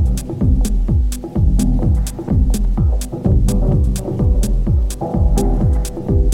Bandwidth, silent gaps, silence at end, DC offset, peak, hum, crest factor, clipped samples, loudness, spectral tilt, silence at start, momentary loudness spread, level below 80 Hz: 16 kHz; none; 0 s; under 0.1%; -4 dBFS; none; 12 dB; under 0.1%; -17 LUFS; -7.5 dB/octave; 0 s; 3 LU; -16 dBFS